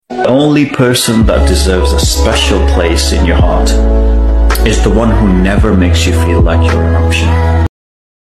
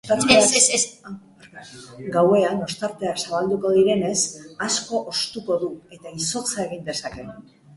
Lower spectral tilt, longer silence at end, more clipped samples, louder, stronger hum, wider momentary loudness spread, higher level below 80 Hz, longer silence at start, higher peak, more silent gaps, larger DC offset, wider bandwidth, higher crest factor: first, -5.5 dB/octave vs -2.5 dB/octave; first, 0.65 s vs 0.35 s; neither; first, -10 LUFS vs -21 LUFS; neither; second, 2 LU vs 24 LU; first, -12 dBFS vs -58 dBFS; about the same, 0.1 s vs 0.05 s; about the same, 0 dBFS vs -2 dBFS; neither; neither; first, 14.5 kHz vs 11.5 kHz; second, 8 dB vs 20 dB